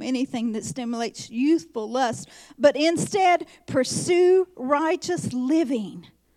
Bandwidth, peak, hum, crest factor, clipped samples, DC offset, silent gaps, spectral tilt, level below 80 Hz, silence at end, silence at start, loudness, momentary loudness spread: 13.5 kHz; -6 dBFS; none; 18 dB; under 0.1%; under 0.1%; none; -4.5 dB/octave; -66 dBFS; 0.35 s; 0 s; -23 LUFS; 10 LU